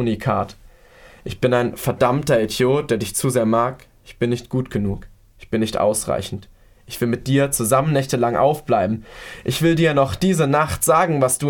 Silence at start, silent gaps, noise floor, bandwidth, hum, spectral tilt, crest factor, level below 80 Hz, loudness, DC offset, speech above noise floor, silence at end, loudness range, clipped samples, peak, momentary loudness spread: 0 s; none; -47 dBFS; 19 kHz; none; -5 dB/octave; 16 dB; -44 dBFS; -19 LUFS; under 0.1%; 28 dB; 0 s; 4 LU; under 0.1%; -4 dBFS; 10 LU